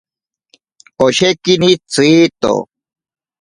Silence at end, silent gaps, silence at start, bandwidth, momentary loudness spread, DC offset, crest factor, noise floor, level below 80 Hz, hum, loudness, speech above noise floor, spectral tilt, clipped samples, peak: 0.75 s; none; 1 s; 11.5 kHz; 7 LU; under 0.1%; 14 dB; -56 dBFS; -52 dBFS; none; -12 LUFS; 44 dB; -4.5 dB/octave; under 0.1%; 0 dBFS